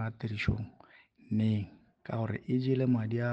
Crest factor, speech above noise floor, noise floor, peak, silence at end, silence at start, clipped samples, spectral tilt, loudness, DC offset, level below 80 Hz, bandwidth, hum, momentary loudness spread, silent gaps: 16 dB; 28 dB; -59 dBFS; -16 dBFS; 0 s; 0 s; under 0.1%; -9 dB/octave; -32 LUFS; under 0.1%; -54 dBFS; 7.4 kHz; none; 13 LU; none